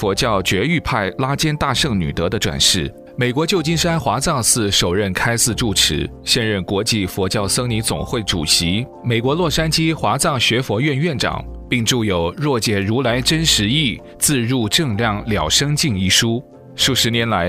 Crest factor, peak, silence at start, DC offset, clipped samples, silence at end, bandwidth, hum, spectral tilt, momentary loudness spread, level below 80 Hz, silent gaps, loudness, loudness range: 18 dB; 0 dBFS; 0 s; under 0.1%; under 0.1%; 0 s; 16 kHz; none; -3.5 dB/octave; 6 LU; -36 dBFS; none; -17 LUFS; 2 LU